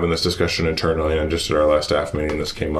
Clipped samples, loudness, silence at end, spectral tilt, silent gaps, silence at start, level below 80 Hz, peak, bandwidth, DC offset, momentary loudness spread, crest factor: under 0.1%; -20 LUFS; 0 s; -5 dB/octave; none; 0 s; -34 dBFS; -4 dBFS; 14.5 kHz; under 0.1%; 6 LU; 16 dB